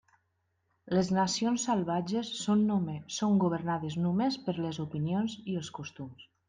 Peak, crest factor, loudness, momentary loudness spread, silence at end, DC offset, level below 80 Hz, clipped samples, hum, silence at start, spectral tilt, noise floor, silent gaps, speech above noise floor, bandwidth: -16 dBFS; 14 dB; -31 LUFS; 9 LU; 0.25 s; under 0.1%; -70 dBFS; under 0.1%; none; 0.85 s; -5.5 dB/octave; -77 dBFS; none; 47 dB; 9.8 kHz